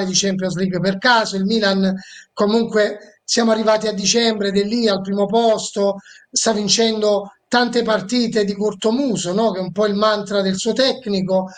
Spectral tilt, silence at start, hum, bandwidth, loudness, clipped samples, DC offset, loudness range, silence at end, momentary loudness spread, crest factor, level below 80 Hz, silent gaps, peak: -4 dB/octave; 0 s; none; 9.8 kHz; -18 LUFS; under 0.1%; under 0.1%; 1 LU; 0 s; 5 LU; 16 dB; -58 dBFS; none; -2 dBFS